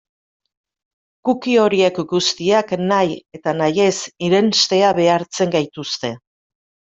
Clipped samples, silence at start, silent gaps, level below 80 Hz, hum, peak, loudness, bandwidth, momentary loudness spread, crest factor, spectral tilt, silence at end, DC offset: under 0.1%; 1.25 s; none; -62 dBFS; none; -2 dBFS; -17 LUFS; 8 kHz; 10 LU; 16 dB; -4 dB/octave; 0.8 s; under 0.1%